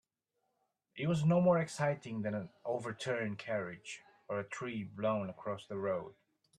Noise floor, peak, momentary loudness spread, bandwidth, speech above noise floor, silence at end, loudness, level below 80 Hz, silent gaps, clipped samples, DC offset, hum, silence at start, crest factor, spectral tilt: -84 dBFS; -20 dBFS; 13 LU; 11.5 kHz; 49 dB; 0.45 s; -36 LUFS; -74 dBFS; none; under 0.1%; under 0.1%; none; 0.95 s; 18 dB; -6.5 dB/octave